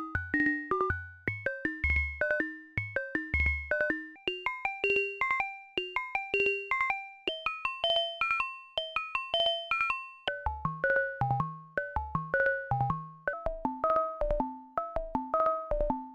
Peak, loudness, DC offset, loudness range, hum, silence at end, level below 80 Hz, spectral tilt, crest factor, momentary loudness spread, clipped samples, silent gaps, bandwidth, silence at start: -14 dBFS; -31 LUFS; under 0.1%; 2 LU; none; 0 s; -44 dBFS; -6 dB/octave; 18 dB; 7 LU; under 0.1%; none; 11 kHz; 0 s